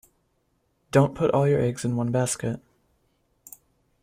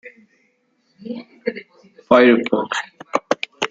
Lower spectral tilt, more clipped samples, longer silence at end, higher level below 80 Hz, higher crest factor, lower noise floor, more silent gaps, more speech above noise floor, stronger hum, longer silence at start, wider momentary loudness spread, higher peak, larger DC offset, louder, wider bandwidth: first, -6.5 dB/octave vs -4.5 dB/octave; neither; first, 1.45 s vs 0.05 s; first, -56 dBFS vs -66 dBFS; about the same, 20 dB vs 20 dB; first, -70 dBFS vs -64 dBFS; neither; about the same, 48 dB vs 49 dB; neither; first, 0.95 s vs 0.05 s; second, 9 LU vs 20 LU; second, -6 dBFS vs -2 dBFS; neither; second, -24 LUFS vs -18 LUFS; first, 16 kHz vs 8 kHz